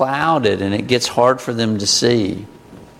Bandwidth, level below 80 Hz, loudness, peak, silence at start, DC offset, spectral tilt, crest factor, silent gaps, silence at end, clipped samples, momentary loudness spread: 16 kHz; -52 dBFS; -16 LUFS; 0 dBFS; 0 s; under 0.1%; -4 dB/octave; 16 dB; none; 0.15 s; under 0.1%; 6 LU